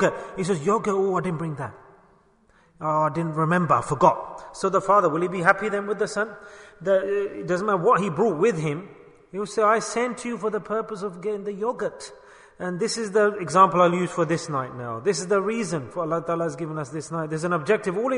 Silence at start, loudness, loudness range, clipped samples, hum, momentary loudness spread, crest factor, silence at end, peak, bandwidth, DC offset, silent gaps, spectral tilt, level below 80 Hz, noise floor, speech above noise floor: 0 s; -24 LUFS; 5 LU; under 0.1%; none; 12 LU; 22 dB; 0 s; -2 dBFS; 10.5 kHz; under 0.1%; none; -5.5 dB/octave; -60 dBFS; -59 dBFS; 36 dB